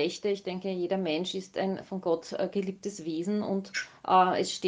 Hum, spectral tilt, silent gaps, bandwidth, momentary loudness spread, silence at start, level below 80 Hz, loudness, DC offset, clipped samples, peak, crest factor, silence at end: none; -5 dB/octave; none; 9.8 kHz; 11 LU; 0 s; -74 dBFS; -30 LUFS; under 0.1%; under 0.1%; -10 dBFS; 20 dB; 0 s